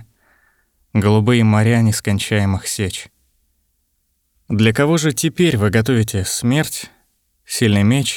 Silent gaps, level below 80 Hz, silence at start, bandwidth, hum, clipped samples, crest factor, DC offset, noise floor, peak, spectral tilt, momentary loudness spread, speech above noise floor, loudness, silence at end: none; -50 dBFS; 0 s; 19.5 kHz; none; under 0.1%; 16 dB; under 0.1%; -66 dBFS; -2 dBFS; -5.5 dB/octave; 10 LU; 51 dB; -16 LUFS; 0 s